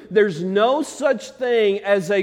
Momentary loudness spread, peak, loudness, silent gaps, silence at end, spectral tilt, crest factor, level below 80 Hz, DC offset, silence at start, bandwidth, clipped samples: 4 LU; -4 dBFS; -20 LUFS; none; 0 s; -5 dB/octave; 16 dB; -66 dBFS; under 0.1%; 0 s; 13 kHz; under 0.1%